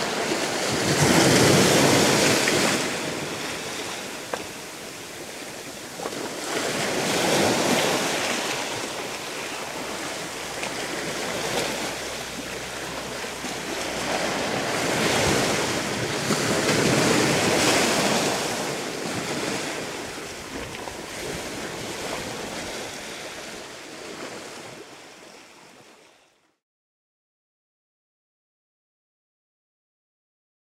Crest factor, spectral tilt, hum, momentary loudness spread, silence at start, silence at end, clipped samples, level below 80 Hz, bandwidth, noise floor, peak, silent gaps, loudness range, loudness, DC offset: 22 dB; -3 dB/octave; none; 17 LU; 0 s; 4.85 s; under 0.1%; -54 dBFS; 16 kHz; -61 dBFS; -4 dBFS; none; 14 LU; -24 LUFS; under 0.1%